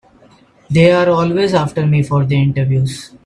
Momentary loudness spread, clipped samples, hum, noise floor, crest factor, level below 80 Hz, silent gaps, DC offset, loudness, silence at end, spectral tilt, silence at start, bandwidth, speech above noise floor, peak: 6 LU; under 0.1%; none; -47 dBFS; 14 dB; -48 dBFS; none; under 0.1%; -14 LUFS; 0.2 s; -7.5 dB/octave; 0.7 s; 11.5 kHz; 34 dB; 0 dBFS